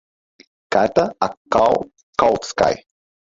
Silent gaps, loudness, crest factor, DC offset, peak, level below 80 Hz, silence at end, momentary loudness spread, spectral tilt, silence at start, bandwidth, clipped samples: 1.37-1.45 s, 2.03-2.13 s; -19 LUFS; 18 dB; under 0.1%; -2 dBFS; -50 dBFS; 0.55 s; 8 LU; -4.5 dB/octave; 0.7 s; 7.8 kHz; under 0.1%